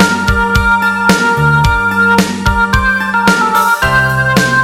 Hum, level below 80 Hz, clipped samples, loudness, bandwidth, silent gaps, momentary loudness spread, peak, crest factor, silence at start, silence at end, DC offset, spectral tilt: none; -24 dBFS; under 0.1%; -10 LUFS; 17 kHz; none; 2 LU; 0 dBFS; 10 dB; 0 s; 0 s; 0.4%; -4.5 dB/octave